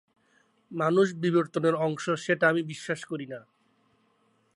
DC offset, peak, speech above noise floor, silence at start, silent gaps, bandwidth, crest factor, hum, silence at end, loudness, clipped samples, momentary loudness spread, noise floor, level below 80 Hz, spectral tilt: under 0.1%; -10 dBFS; 42 dB; 0.7 s; none; 11.5 kHz; 20 dB; none; 1.15 s; -27 LUFS; under 0.1%; 13 LU; -69 dBFS; -78 dBFS; -6 dB/octave